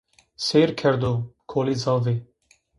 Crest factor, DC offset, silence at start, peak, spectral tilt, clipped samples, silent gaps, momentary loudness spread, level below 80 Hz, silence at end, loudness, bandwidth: 18 dB; under 0.1%; 0.4 s; -6 dBFS; -6 dB/octave; under 0.1%; none; 9 LU; -54 dBFS; 0.55 s; -23 LUFS; 11.5 kHz